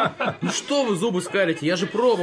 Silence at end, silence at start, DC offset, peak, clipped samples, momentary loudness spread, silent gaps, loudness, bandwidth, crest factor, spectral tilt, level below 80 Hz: 0 s; 0 s; under 0.1%; -8 dBFS; under 0.1%; 3 LU; none; -23 LUFS; 11 kHz; 14 dB; -4.5 dB/octave; -70 dBFS